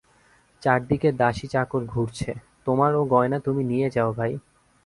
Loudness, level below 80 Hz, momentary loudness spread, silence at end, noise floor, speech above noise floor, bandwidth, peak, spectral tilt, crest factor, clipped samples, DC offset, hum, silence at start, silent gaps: -24 LUFS; -52 dBFS; 8 LU; 0.45 s; -59 dBFS; 36 dB; 11.5 kHz; -4 dBFS; -7.5 dB/octave; 20 dB; under 0.1%; under 0.1%; none; 0.6 s; none